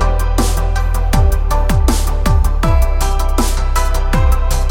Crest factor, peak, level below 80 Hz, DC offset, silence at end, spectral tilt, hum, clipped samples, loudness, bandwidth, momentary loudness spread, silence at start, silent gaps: 10 dB; 0 dBFS; -12 dBFS; under 0.1%; 0 s; -5.5 dB/octave; none; under 0.1%; -16 LUFS; 17 kHz; 3 LU; 0 s; none